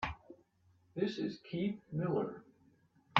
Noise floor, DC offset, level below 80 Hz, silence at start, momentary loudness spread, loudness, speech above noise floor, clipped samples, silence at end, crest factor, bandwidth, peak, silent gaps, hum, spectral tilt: -71 dBFS; under 0.1%; -64 dBFS; 0 s; 13 LU; -39 LUFS; 33 dB; under 0.1%; 0 s; 28 dB; 7.6 kHz; -10 dBFS; none; none; -4.5 dB/octave